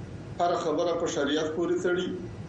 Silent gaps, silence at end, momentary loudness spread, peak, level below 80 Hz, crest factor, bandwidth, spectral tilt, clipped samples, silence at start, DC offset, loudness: none; 0 s; 3 LU; -16 dBFS; -56 dBFS; 12 dB; 8.6 kHz; -5 dB/octave; under 0.1%; 0 s; under 0.1%; -28 LUFS